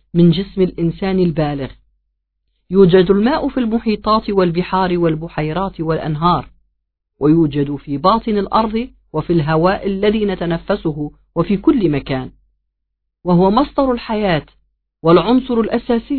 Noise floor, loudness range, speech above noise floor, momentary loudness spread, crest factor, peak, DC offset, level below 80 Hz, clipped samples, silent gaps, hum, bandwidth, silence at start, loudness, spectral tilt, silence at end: -74 dBFS; 3 LU; 59 dB; 8 LU; 16 dB; 0 dBFS; 0.2%; -38 dBFS; under 0.1%; none; none; 4.5 kHz; 0.15 s; -16 LUFS; -11 dB/octave; 0 s